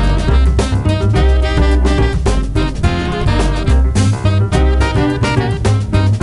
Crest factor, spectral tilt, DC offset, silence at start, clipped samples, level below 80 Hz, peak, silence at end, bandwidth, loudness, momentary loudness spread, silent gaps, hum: 12 dB; -6.5 dB/octave; 0.4%; 0 s; under 0.1%; -16 dBFS; 0 dBFS; 0 s; 11.5 kHz; -14 LUFS; 3 LU; none; none